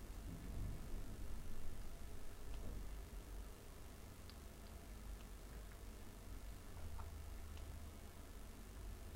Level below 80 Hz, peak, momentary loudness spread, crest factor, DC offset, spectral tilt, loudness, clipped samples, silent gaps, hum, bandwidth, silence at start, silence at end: -52 dBFS; -32 dBFS; 5 LU; 16 dB; under 0.1%; -5 dB/octave; -55 LUFS; under 0.1%; none; none; 16 kHz; 0 s; 0 s